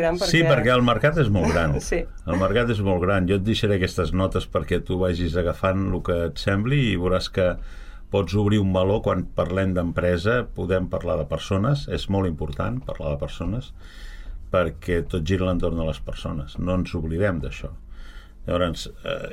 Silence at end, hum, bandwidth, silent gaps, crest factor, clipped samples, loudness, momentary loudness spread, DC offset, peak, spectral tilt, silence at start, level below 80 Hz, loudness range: 0 s; none; 14.5 kHz; none; 16 dB; under 0.1%; -23 LUFS; 11 LU; under 0.1%; -6 dBFS; -6.5 dB/octave; 0 s; -36 dBFS; 6 LU